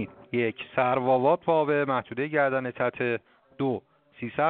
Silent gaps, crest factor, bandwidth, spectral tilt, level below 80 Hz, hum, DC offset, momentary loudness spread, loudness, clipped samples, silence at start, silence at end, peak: none; 18 dB; 4.5 kHz; -5 dB/octave; -68 dBFS; none; under 0.1%; 9 LU; -27 LUFS; under 0.1%; 0 s; 0 s; -8 dBFS